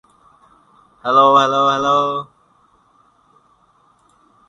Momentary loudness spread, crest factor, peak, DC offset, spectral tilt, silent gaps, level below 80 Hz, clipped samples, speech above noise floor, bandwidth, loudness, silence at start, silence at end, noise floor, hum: 16 LU; 18 dB; 0 dBFS; under 0.1%; -4.5 dB/octave; none; -64 dBFS; under 0.1%; 42 dB; 9.4 kHz; -14 LUFS; 1.05 s; 2.25 s; -56 dBFS; none